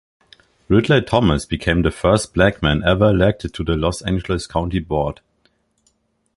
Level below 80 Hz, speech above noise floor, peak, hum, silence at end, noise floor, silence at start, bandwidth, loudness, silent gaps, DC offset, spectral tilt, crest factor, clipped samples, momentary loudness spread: -32 dBFS; 47 dB; -2 dBFS; none; 1.25 s; -64 dBFS; 0.7 s; 11.5 kHz; -18 LUFS; none; under 0.1%; -6 dB/octave; 18 dB; under 0.1%; 7 LU